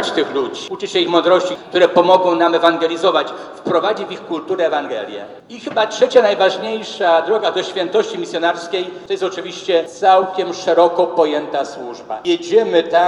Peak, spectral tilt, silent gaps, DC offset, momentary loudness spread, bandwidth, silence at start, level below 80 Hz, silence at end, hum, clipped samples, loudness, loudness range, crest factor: 0 dBFS; -4 dB/octave; none; under 0.1%; 12 LU; 11 kHz; 0 s; -66 dBFS; 0 s; none; under 0.1%; -16 LUFS; 4 LU; 16 dB